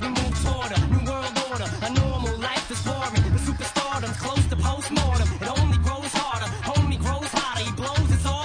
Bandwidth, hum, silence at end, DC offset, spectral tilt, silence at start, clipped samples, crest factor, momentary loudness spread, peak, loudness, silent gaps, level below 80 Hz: 10.5 kHz; none; 0 s; under 0.1%; -5 dB/octave; 0 s; under 0.1%; 18 dB; 5 LU; -6 dBFS; -24 LUFS; none; -30 dBFS